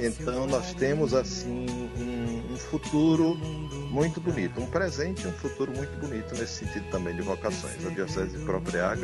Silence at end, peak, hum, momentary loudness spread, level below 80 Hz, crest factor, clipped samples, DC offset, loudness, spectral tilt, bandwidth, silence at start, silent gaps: 0 s; -12 dBFS; none; 9 LU; -44 dBFS; 18 dB; under 0.1%; under 0.1%; -30 LUFS; -5.5 dB/octave; 11.5 kHz; 0 s; none